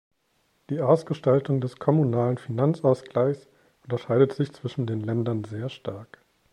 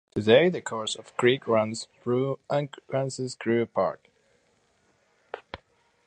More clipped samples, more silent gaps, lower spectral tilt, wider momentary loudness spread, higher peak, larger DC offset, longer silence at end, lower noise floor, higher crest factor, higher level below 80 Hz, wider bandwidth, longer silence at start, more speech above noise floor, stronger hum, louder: neither; neither; first, -9 dB/octave vs -5 dB/octave; second, 12 LU vs 22 LU; about the same, -6 dBFS vs -6 dBFS; neither; about the same, 0.5 s vs 0.5 s; about the same, -69 dBFS vs -67 dBFS; about the same, 20 dB vs 22 dB; about the same, -66 dBFS vs -64 dBFS; first, 11 kHz vs 9.6 kHz; first, 0.7 s vs 0.15 s; about the same, 45 dB vs 42 dB; neither; about the same, -25 LUFS vs -26 LUFS